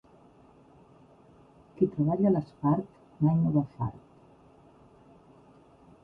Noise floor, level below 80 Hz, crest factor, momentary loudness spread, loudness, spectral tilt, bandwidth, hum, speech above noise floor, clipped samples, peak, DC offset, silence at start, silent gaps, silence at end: -57 dBFS; -60 dBFS; 20 dB; 11 LU; -28 LUFS; -12.5 dB/octave; 4.6 kHz; none; 31 dB; under 0.1%; -12 dBFS; under 0.1%; 1.8 s; none; 2.05 s